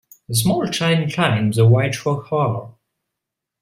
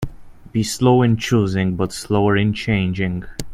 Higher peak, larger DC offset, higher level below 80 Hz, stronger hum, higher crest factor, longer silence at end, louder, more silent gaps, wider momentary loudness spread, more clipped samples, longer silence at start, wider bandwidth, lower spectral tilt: about the same, -2 dBFS vs 0 dBFS; neither; second, -54 dBFS vs -40 dBFS; neither; about the same, 18 dB vs 18 dB; first, 0.9 s vs 0 s; about the same, -18 LUFS vs -19 LUFS; neither; about the same, 8 LU vs 9 LU; neither; first, 0.3 s vs 0 s; about the same, 16 kHz vs 15.5 kHz; about the same, -5.5 dB/octave vs -6 dB/octave